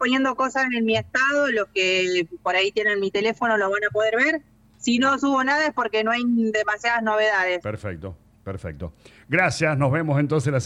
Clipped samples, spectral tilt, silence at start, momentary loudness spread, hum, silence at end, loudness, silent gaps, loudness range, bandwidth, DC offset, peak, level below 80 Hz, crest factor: under 0.1%; -5 dB/octave; 0 s; 13 LU; none; 0 s; -21 LUFS; none; 3 LU; 11.5 kHz; under 0.1%; -6 dBFS; -54 dBFS; 16 dB